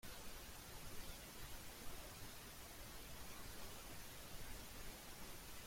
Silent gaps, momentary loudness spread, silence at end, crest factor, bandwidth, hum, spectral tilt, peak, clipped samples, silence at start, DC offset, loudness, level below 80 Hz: none; 1 LU; 0 s; 14 dB; 16.5 kHz; none; -2.5 dB/octave; -38 dBFS; under 0.1%; 0.05 s; under 0.1%; -54 LUFS; -60 dBFS